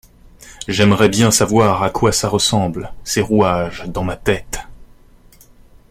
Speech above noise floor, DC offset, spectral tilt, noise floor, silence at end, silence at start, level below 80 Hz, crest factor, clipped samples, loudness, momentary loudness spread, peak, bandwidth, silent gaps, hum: 30 dB; under 0.1%; -4.5 dB/octave; -46 dBFS; 1.05 s; 0.45 s; -38 dBFS; 16 dB; under 0.1%; -16 LUFS; 11 LU; 0 dBFS; 16.5 kHz; none; none